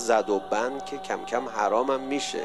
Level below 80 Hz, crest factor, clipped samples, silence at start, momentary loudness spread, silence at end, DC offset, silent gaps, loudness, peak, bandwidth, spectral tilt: -62 dBFS; 18 dB; under 0.1%; 0 s; 8 LU; 0 s; 0.3%; none; -27 LUFS; -10 dBFS; 12.5 kHz; -3 dB/octave